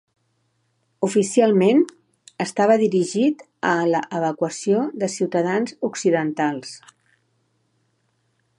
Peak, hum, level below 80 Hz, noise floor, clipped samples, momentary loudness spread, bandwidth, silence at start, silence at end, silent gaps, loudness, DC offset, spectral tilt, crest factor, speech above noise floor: -4 dBFS; none; -74 dBFS; -68 dBFS; under 0.1%; 9 LU; 11.5 kHz; 1 s; 1.8 s; none; -21 LUFS; under 0.1%; -5.5 dB/octave; 18 dB; 49 dB